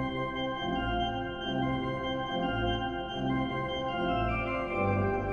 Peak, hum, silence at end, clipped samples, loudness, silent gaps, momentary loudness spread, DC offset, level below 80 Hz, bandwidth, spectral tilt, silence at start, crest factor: -16 dBFS; none; 0 s; under 0.1%; -32 LUFS; none; 3 LU; under 0.1%; -44 dBFS; 6.6 kHz; -7 dB/octave; 0 s; 14 dB